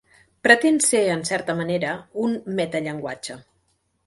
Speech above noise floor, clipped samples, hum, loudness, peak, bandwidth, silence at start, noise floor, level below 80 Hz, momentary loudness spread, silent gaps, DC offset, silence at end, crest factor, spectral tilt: 47 dB; under 0.1%; none; -21 LUFS; 0 dBFS; 12 kHz; 0.45 s; -68 dBFS; -64 dBFS; 16 LU; none; under 0.1%; 0.65 s; 22 dB; -3.5 dB/octave